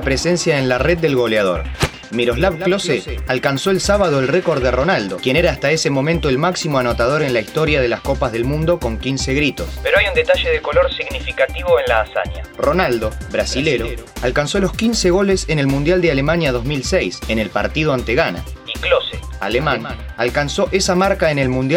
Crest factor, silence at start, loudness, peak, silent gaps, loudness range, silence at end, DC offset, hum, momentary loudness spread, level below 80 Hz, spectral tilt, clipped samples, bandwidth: 16 dB; 0 s; -17 LUFS; 0 dBFS; none; 2 LU; 0 s; under 0.1%; none; 6 LU; -30 dBFS; -5 dB/octave; under 0.1%; over 20 kHz